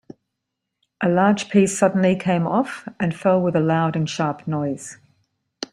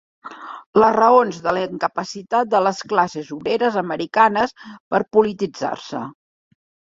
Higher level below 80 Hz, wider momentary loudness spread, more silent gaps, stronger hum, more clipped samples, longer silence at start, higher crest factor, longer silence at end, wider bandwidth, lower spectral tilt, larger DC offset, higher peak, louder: about the same, -60 dBFS vs -60 dBFS; second, 10 LU vs 16 LU; second, none vs 0.66-0.73 s, 4.80-4.91 s; neither; neither; first, 1 s vs 0.25 s; about the same, 18 dB vs 18 dB; second, 0.05 s vs 0.8 s; first, 11.5 kHz vs 7.8 kHz; about the same, -6 dB/octave vs -5 dB/octave; neither; about the same, -2 dBFS vs -2 dBFS; about the same, -20 LUFS vs -19 LUFS